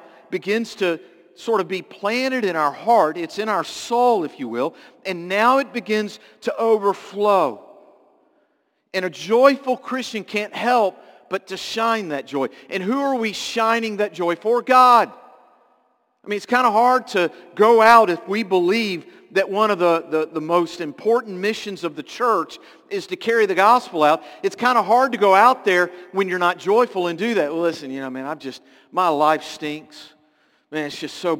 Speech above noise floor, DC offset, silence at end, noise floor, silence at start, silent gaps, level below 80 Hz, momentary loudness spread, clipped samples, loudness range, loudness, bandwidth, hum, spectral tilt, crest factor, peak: 47 dB; under 0.1%; 0 s; -67 dBFS; 0.3 s; none; -72 dBFS; 13 LU; under 0.1%; 6 LU; -19 LUFS; 17 kHz; none; -4.5 dB/octave; 20 dB; 0 dBFS